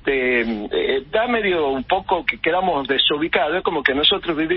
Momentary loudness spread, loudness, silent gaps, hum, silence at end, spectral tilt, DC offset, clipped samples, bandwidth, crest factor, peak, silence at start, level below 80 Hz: 5 LU; -19 LUFS; none; none; 0 s; -9 dB/octave; under 0.1%; under 0.1%; 5.8 kHz; 18 dB; -2 dBFS; 0.05 s; -46 dBFS